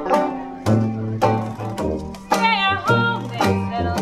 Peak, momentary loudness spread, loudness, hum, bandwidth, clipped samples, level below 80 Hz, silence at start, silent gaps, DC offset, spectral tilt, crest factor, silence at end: -4 dBFS; 8 LU; -20 LUFS; none; 15.5 kHz; under 0.1%; -42 dBFS; 0 s; none; under 0.1%; -6 dB/octave; 16 dB; 0 s